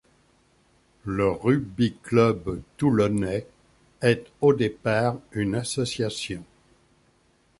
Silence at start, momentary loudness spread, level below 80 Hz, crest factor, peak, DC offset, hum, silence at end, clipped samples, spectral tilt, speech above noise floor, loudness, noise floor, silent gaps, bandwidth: 1.05 s; 11 LU; -52 dBFS; 20 dB; -6 dBFS; under 0.1%; none; 1.15 s; under 0.1%; -6 dB/octave; 40 dB; -25 LUFS; -63 dBFS; none; 11.5 kHz